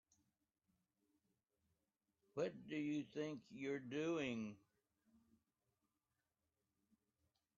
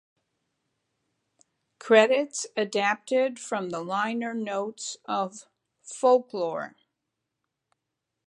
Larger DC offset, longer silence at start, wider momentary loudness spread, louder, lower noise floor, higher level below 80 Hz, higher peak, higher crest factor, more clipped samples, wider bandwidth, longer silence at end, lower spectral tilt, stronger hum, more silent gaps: neither; first, 2.35 s vs 1.85 s; second, 9 LU vs 15 LU; second, -47 LUFS vs -26 LUFS; first, under -90 dBFS vs -84 dBFS; about the same, -88 dBFS vs -84 dBFS; second, -32 dBFS vs -4 dBFS; about the same, 20 dB vs 24 dB; neither; second, 7.2 kHz vs 11 kHz; first, 3 s vs 1.6 s; first, -5 dB/octave vs -3.5 dB/octave; neither; neither